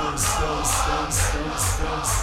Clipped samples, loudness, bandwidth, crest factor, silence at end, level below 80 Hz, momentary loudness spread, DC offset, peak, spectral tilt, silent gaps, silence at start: under 0.1%; -23 LUFS; 16.5 kHz; 14 dB; 0 s; -30 dBFS; 2 LU; under 0.1%; -8 dBFS; -3 dB/octave; none; 0 s